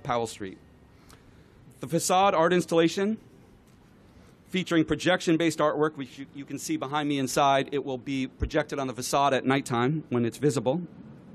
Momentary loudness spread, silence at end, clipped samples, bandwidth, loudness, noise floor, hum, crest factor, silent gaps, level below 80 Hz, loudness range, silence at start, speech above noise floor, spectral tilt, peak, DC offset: 13 LU; 0 s; under 0.1%; 14 kHz; -26 LUFS; -55 dBFS; none; 16 dB; none; -50 dBFS; 2 LU; 0.05 s; 29 dB; -5 dB/octave; -12 dBFS; under 0.1%